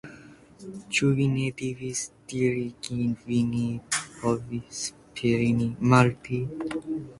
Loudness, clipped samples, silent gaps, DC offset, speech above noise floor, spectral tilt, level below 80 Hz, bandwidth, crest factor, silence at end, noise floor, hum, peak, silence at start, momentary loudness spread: -27 LUFS; under 0.1%; none; under 0.1%; 23 dB; -5.5 dB/octave; -56 dBFS; 11.5 kHz; 22 dB; 0.05 s; -49 dBFS; none; -6 dBFS; 0.05 s; 12 LU